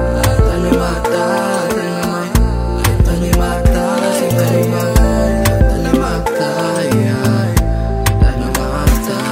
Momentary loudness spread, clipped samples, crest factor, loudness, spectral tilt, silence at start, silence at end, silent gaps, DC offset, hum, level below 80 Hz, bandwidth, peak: 3 LU; under 0.1%; 12 dB; -15 LUFS; -6 dB/octave; 0 s; 0 s; none; under 0.1%; none; -18 dBFS; 16.5 kHz; 0 dBFS